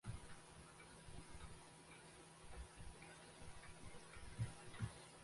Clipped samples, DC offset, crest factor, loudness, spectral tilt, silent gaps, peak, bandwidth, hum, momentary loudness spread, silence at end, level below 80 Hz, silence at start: under 0.1%; under 0.1%; 20 dB; -57 LUFS; -4.5 dB/octave; none; -34 dBFS; 11.5 kHz; none; 10 LU; 0 s; -64 dBFS; 0.05 s